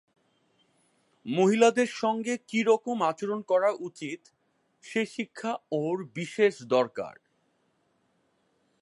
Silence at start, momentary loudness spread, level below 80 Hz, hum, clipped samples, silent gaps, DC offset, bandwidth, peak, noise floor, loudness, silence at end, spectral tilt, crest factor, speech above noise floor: 1.25 s; 15 LU; -80 dBFS; none; under 0.1%; none; under 0.1%; 11.5 kHz; -8 dBFS; -72 dBFS; -27 LUFS; 1.7 s; -5 dB/octave; 22 dB; 44 dB